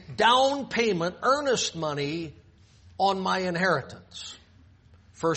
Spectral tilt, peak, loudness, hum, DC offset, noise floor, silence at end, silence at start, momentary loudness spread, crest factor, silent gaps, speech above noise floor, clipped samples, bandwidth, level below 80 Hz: -3.5 dB/octave; -6 dBFS; -25 LUFS; none; under 0.1%; -56 dBFS; 0 s; 0 s; 18 LU; 20 dB; none; 30 dB; under 0.1%; 8.4 kHz; -60 dBFS